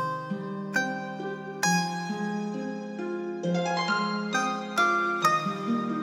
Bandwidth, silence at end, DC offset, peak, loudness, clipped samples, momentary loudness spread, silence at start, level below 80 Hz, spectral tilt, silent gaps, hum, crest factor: 16 kHz; 0 s; under 0.1%; -10 dBFS; -28 LUFS; under 0.1%; 10 LU; 0 s; -84 dBFS; -4 dB/octave; none; none; 18 dB